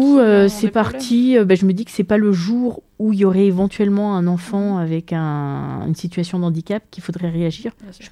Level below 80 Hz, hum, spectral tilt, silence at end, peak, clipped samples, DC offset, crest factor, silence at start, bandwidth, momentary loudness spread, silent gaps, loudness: -50 dBFS; none; -7.5 dB/octave; 0.05 s; -2 dBFS; under 0.1%; under 0.1%; 14 dB; 0 s; 13.5 kHz; 11 LU; none; -18 LUFS